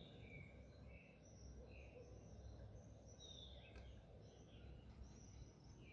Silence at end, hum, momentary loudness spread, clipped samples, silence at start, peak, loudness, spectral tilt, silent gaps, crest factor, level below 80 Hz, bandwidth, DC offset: 0 s; none; 4 LU; under 0.1%; 0 s; -46 dBFS; -61 LUFS; -5 dB/octave; none; 14 dB; -64 dBFS; 7.4 kHz; under 0.1%